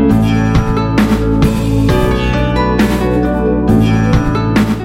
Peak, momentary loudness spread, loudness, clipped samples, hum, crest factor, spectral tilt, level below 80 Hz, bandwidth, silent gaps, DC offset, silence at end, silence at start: 0 dBFS; 3 LU; -12 LUFS; under 0.1%; none; 10 dB; -7.5 dB/octave; -20 dBFS; 16 kHz; none; under 0.1%; 0 s; 0 s